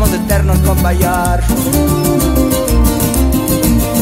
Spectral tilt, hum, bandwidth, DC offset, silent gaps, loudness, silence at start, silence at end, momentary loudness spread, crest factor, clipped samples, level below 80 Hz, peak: -5.5 dB/octave; none; 16.5 kHz; under 0.1%; none; -12 LUFS; 0 s; 0 s; 1 LU; 12 dB; under 0.1%; -16 dBFS; 0 dBFS